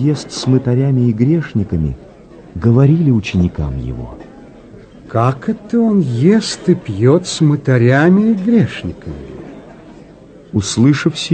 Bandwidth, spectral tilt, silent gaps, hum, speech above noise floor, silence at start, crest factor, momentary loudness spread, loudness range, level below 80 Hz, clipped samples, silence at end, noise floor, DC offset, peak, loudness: 9.2 kHz; -7 dB/octave; none; none; 26 dB; 0 s; 14 dB; 18 LU; 4 LU; -36 dBFS; under 0.1%; 0 s; -39 dBFS; under 0.1%; 0 dBFS; -14 LUFS